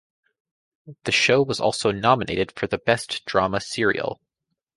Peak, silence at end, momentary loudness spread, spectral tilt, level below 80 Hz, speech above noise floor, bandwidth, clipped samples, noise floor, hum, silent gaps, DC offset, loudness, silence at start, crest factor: -2 dBFS; 0.6 s; 8 LU; -4 dB/octave; -54 dBFS; 58 dB; 11.5 kHz; under 0.1%; -81 dBFS; none; none; under 0.1%; -22 LUFS; 0.85 s; 22 dB